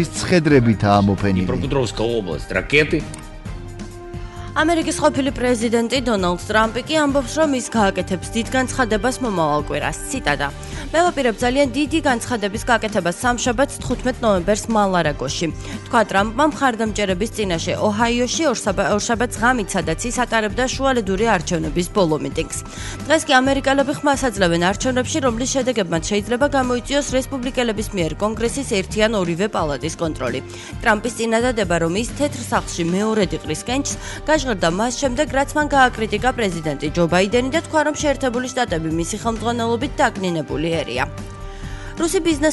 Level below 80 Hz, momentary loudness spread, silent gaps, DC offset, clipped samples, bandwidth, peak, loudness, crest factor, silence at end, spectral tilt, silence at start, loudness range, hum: -36 dBFS; 7 LU; none; under 0.1%; under 0.1%; 12 kHz; -2 dBFS; -19 LUFS; 16 dB; 0 s; -4.5 dB/octave; 0 s; 3 LU; none